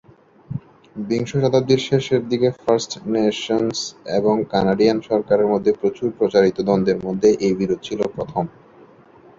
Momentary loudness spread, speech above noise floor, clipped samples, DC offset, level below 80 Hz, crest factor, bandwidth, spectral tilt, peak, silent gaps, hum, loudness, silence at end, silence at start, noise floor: 9 LU; 29 dB; under 0.1%; under 0.1%; -54 dBFS; 16 dB; 7.8 kHz; -6 dB/octave; -2 dBFS; none; none; -19 LUFS; 0.9 s; 0.5 s; -48 dBFS